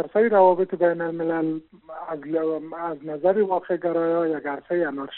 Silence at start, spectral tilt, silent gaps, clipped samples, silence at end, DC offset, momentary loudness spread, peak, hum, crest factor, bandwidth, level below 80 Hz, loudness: 0 s; -5.5 dB/octave; none; under 0.1%; 0 s; under 0.1%; 14 LU; -6 dBFS; none; 18 dB; 4.2 kHz; -72 dBFS; -23 LUFS